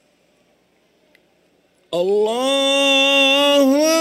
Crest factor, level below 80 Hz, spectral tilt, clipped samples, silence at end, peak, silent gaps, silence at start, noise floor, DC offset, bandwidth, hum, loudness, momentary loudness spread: 14 dB; -70 dBFS; -1.5 dB/octave; under 0.1%; 0 s; -4 dBFS; none; 1.9 s; -60 dBFS; under 0.1%; 16 kHz; none; -15 LUFS; 7 LU